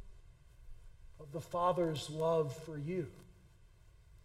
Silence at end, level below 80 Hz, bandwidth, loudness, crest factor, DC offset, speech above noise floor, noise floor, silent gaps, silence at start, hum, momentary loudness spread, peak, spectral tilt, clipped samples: 0.05 s; -60 dBFS; 15.5 kHz; -37 LUFS; 18 dB; under 0.1%; 26 dB; -62 dBFS; none; 0 s; none; 15 LU; -20 dBFS; -6.5 dB/octave; under 0.1%